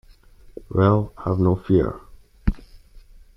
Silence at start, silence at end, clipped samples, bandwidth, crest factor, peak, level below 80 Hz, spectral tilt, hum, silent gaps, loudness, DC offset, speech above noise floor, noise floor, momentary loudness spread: 0.7 s; 0.4 s; under 0.1%; 5.6 kHz; 18 dB; -4 dBFS; -36 dBFS; -10.5 dB/octave; none; none; -22 LUFS; under 0.1%; 29 dB; -48 dBFS; 10 LU